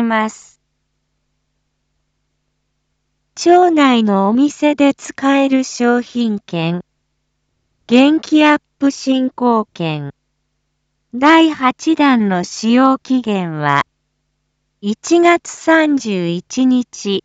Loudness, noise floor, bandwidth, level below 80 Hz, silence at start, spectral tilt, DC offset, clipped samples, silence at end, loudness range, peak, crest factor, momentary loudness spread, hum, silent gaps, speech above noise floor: -14 LUFS; -69 dBFS; 8.2 kHz; -62 dBFS; 0 s; -5 dB/octave; under 0.1%; under 0.1%; 0.05 s; 3 LU; 0 dBFS; 16 dB; 11 LU; none; none; 55 dB